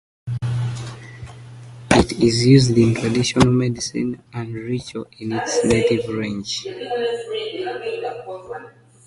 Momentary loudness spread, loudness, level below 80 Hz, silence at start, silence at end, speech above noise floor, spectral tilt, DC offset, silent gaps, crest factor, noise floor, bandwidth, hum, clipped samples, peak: 19 LU; -20 LUFS; -42 dBFS; 0.25 s; 0.4 s; 22 dB; -5.5 dB/octave; under 0.1%; none; 20 dB; -41 dBFS; 11.5 kHz; none; under 0.1%; 0 dBFS